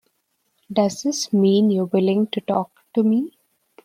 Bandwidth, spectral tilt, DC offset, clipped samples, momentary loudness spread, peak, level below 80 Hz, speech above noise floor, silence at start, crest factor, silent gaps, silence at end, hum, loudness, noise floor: 14 kHz; -6 dB/octave; under 0.1%; under 0.1%; 8 LU; -4 dBFS; -68 dBFS; 51 dB; 0.7 s; 16 dB; none; 0.55 s; none; -20 LUFS; -70 dBFS